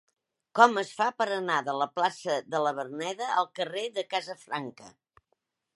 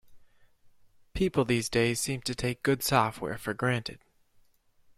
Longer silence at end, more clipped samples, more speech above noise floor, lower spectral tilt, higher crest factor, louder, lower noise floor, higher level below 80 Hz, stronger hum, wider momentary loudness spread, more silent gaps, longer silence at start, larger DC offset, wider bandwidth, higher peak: second, 0.85 s vs 1 s; neither; first, 50 dB vs 35 dB; about the same, -3.5 dB/octave vs -4.5 dB/octave; about the same, 26 dB vs 22 dB; about the same, -28 LUFS vs -29 LUFS; first, -78 dBFS vs -63 dBFS; second, -84 dBFS vs -52 dBFS; neither; first, 14 LU vs 9 LU; neither; first, 0.55 s vs 0.1 s; neither; second, 11.5 kHz vs 15.5 kHz; first, -4 dBFS vs -10 dBFS